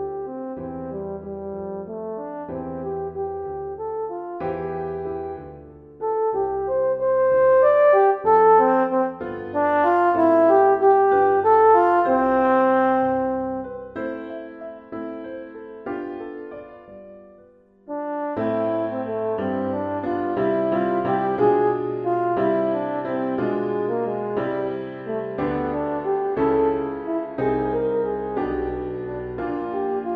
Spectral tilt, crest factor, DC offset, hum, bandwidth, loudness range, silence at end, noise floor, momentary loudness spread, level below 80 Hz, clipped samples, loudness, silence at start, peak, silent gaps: -9.5 dB/octave; 16 dB; under 0.1%; none; 4.9 kHz; 13 LU; 0 s; -52 dBFS; 16 LU; -52 dBFS; under 0.1%; -22 LUFS; 0 s; -6 dBFS; none